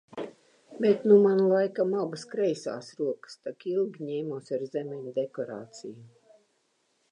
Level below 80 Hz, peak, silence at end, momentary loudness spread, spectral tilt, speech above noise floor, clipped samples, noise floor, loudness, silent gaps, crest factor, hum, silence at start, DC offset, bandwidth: -82 dBFS; -8 dBFS; 1.05 s; 20 LU; -7 dB/octave; 45 dB; under 0.1%; -72 dBFS; -28 LUFS; none; 20 dB; none; 0.1 s; under 0.1%; 9.8 kHz